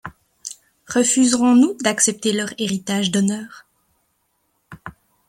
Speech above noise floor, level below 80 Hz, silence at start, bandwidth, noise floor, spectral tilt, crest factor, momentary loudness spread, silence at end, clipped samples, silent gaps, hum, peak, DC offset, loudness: 50 dB; -60 dBFS; 0.05 s; 15 kHz; -68 dBFS; -3.5 dB/octave; 18 dB; 24 LU; 0.4 s; under 0.1%; none; none; -2 dBFS; under 0.1%; -18 LUFS